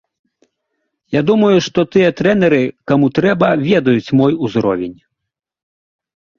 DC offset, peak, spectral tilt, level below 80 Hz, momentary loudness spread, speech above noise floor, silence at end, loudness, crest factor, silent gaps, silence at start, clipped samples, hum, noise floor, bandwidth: under 0.1%; -2 dBFS; -7 dB/octave; -52 dBFS; 5 LU; 67 dB; 1.45 s; -14 LUFS; 14 dB; none; 1.1 s; under 0.1%; none; -80 dBFS; 7.2 kHz